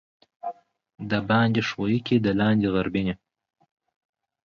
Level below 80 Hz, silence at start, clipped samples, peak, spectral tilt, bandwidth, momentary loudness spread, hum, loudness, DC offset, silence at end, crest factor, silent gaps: -54 dBFS; 0.45 s; under 0.1%; -8 dBFS; -7.5 dB/octave; 6.8 kHz; 16 LU; none; -24 LUFS; under 0.1%; 1.35 s; 16 dB; none